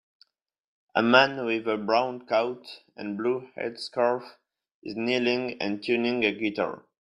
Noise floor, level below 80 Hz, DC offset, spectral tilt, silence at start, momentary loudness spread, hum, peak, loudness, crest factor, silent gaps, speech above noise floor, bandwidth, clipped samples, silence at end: -64 dBFS; -72 dBFS; under 0.1%; -5.5 dB/octave; 0.95 s; 16 LU; none; -2 dBFS; -26 LUFS; 24 dB; 4.74-4.82 s; 38 dB; 10.5 kHz; under 0.1%; 0.35 s